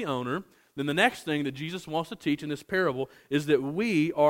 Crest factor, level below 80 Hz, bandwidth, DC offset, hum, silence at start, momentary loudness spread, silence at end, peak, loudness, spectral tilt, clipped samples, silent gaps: 20 dB; -66 dBFS; 16.5 kHz; under 0.1%; none; 0 s; 10 LU; 0 s; -8 dBFS; -29 LUFS; -5.5 dB/octave; under 0.1%; none